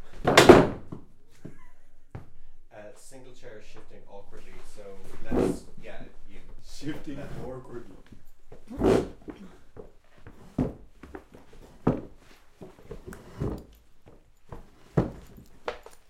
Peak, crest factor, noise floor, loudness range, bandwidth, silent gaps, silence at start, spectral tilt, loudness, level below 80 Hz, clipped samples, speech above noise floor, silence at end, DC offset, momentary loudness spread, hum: 0 dBFS; 28 dB; -51 dBFS; 16 LU; 16 kHz; none; 0 s; -5.5 dB/octave; -25 LUFS; -44 dBFS; under 0.1%; 21 dB; 0.15 s; under 0.1%; 26 LU; none